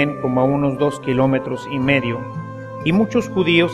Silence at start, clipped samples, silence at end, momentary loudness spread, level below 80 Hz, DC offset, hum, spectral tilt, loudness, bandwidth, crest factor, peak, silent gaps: 0 s; under 0.1%; 0 s; 10 LU; -48 dBFS; under 0.1%; none; -7 dB/octave; -19 LUFS; 12 kHz; 18 dB; -2 dBFS; none